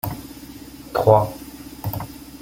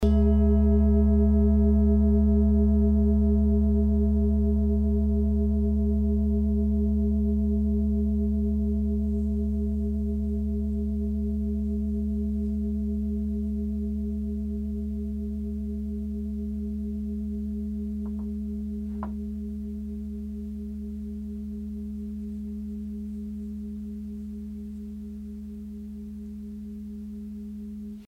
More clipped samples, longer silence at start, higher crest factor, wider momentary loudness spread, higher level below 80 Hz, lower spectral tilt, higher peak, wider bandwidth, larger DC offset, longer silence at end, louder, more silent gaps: neither; about the same, 0.05 s vs 0 s; first, 22 dB vs 14 dB; first, 22 LU vs 16 LU; second, -46 dBFS vs -30 dBFS; second, -7 dB/octave vs -11.5 dB/octave; first, -2 dBFS vs -12 dBFS; first, 17 kHz vs 1.8 kHz; neither; about the same, 0.05 s vs 0 s; first, -21 LUFS vs -27 LUFS; neither